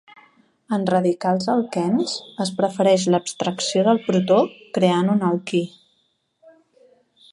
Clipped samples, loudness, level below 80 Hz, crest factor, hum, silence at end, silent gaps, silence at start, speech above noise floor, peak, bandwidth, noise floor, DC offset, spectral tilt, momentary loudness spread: under 0.1%; -20 LUFS; -70 dBFS; 18 dB; none; 1.65 s; none; 0.7 s; 48 dB; -2 dBFS; 11.5 kHz; -68 dBFS; under 0.1%; -5.5 dB/octave; 8 LU